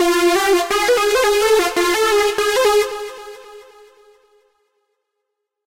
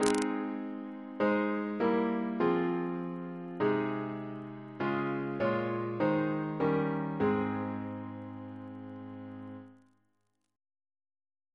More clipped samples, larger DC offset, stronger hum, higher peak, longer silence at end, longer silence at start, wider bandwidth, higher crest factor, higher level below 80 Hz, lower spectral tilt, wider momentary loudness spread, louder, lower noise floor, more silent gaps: neither; neither; neither; about the same, -6 dBFS vs -8 dBFS; first, 2.05 s vs 1.8 s; about the same, 0 s vs 0 s; first, 16 kHz vs 11 kHz; second, 12 dB vs 26 dB; first, -48 dBFS vs -70 dBFS; second, -1 dB/octave vs -6.5 dB/octave; about the same, 13 LU vs 15 LU; first, -15 LUFS vs -33 LUFS; about the same, -77 dBFS vs -80 dBFS; neither